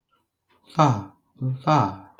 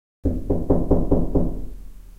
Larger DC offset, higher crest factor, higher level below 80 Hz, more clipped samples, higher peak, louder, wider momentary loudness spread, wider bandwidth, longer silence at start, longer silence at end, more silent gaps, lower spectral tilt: neither; first, 22 dB vs 16 dB; second, -64 dBFS vs -28 dBFS; neither; about the same, -2 dBFS vs -4 dBFS; about the same, -23 LUFS vs -23 LUFS; about the same, 11 LU vs 12 LU; first, 7.8 kHz vs 1.9 kHz; first, 0.75 s vs 0.25 s; first, 0.2 s vs 0.05 s; neither; second, -7 dB/octave vs -11.5 dB/octave